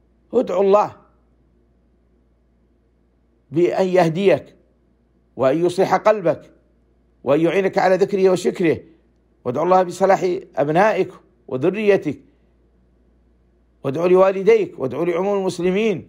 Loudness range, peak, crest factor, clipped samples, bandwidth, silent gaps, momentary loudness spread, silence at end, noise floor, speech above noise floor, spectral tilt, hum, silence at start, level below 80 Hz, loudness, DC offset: 5 LU; -4 dBFS; 16 dB; under 0.1%; 13.5 kHz; none; 10 LU; 0.05 s; -60 dBFS; 42 dB; -6.5 dB/octave; none; 0.3 s; -60 dBFS; -18 LUFS; under 0.1%